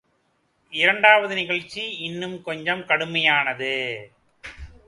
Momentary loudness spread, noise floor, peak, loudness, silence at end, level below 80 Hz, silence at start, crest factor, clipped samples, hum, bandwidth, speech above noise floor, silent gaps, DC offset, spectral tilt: 21 LU; -68 dBFS; 0 dBFS; -21 LUFS; 0.2 s; -54 dBFS; 0.7 s; 22 dB; under 0.1%; none; 11.5 kHz; 45 dB; none; under 0.1%; -4 dB/octave